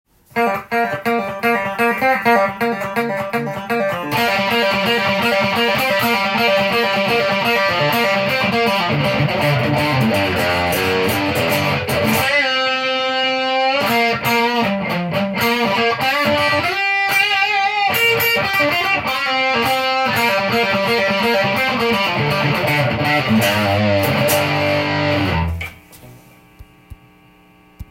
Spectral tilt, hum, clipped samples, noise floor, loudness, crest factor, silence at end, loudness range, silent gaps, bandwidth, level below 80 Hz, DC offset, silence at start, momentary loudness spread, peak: -4.5 dB/octave; none; under 0.1%; -49 dBFS; -16 LUFS; 16 dB; 0.1 s; 3 LU; none; 17 kHz; -48 dBFS; under 0.1%; 0.35 s; 5 LU; 0 dBFS